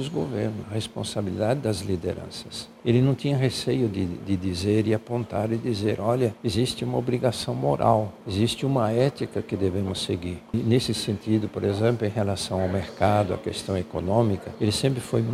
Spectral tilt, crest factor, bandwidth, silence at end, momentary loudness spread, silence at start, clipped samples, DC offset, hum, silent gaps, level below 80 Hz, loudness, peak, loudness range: -6 dB/octave; 18 dB; 15 kHz; 0 s; 7 LU; 0 s; under 0.1%; under 0.1%; none; none; -52 dBFS; -25 LUFS; -6 dBFS; 1 LU